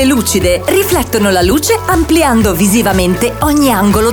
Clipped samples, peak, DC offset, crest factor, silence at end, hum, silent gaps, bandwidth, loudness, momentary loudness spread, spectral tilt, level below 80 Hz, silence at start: under 0.1%; 0 dBFS; 0.2%; 10 dB; 0 s; none; none; over 20 kHz; -10 LUFS; 2 LU; -4.5 dB/octave; -24 dBFS; 0 s